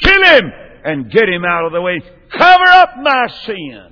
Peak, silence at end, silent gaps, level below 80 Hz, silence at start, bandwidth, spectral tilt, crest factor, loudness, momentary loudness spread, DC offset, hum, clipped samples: 0 dBFS; 0.1 s; none; -32 dBFS; 0 s; 5.4 kHz; -5 dB/octave; 12 dB; -10 LUFS; 19 LU; under 0.1%; none; 0.3%